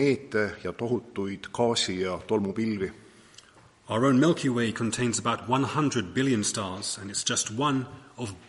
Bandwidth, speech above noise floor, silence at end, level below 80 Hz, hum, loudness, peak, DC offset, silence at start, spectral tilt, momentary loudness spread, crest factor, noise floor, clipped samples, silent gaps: 11.5 kHz; 28 dB; 0.1 s; -62 dBFS; none; -27 LUFS; -10 dBFS; under 0.1%; 0 s; -4.5 dB/octave; 10 LU; 18 dB; -55 dBFS; under 0.1%; none